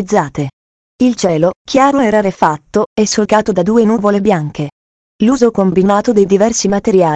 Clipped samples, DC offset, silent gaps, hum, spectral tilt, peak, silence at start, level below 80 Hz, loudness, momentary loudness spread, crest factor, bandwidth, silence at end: 0.1%; under 0.1%; 0.53-0.99 s, 1.56-1.65 s, 2.86-2.96 s, 4.72-5.19 s; none; -5.5 dB/octave; 0 dBFS; 0 s; -44 dBFS; -12 LUFS; 6 LU; 12 dB; 8.8 kHz; 0 s